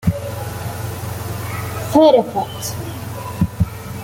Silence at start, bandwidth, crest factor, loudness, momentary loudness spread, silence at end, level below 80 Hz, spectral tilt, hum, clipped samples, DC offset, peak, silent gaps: 0 s; 17 kHz; 18 dB; -20 LUFS; 15 LU; 0 s; -38 dBFS; -6 dB/octave; none; under 0.1%; under 0.1%; -2 dBFS; none